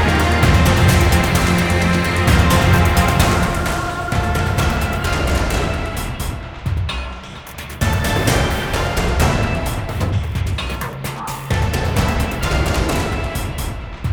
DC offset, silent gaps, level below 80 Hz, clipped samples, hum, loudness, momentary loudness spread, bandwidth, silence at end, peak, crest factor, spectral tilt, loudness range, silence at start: under 0.1%; none; -24 dBFS; under 0.1%; none; -18 LUFS; 12 LU; over 20 kHz; 0 s; 0 dBFS; 16 dB; -5 dB/octave; 7 LU; 0 s